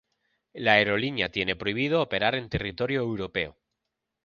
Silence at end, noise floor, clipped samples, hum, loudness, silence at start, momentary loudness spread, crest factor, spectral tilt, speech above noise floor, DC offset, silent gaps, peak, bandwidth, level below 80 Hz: 0.75 s; -84 dBFS; under 0.1%; none; -26 LUFS; 0.55 s; 10 LU; 24 dB; -6.5 dB/octave; 57 dB; under 0.1%; none; -4 dBFS; 7 kHz; -52 dBFS